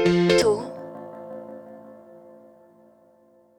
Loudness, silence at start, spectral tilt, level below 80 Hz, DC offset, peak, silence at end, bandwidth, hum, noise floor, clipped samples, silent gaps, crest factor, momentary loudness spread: -21 LUFS; 0 s; -5.5 dB/octave; -56 dBFS; under 0.1%; -6 dBFS; 1.65 s; 14 kHz; none; -57 dBFS; under 0.1%; none; 20 dB; 27 LU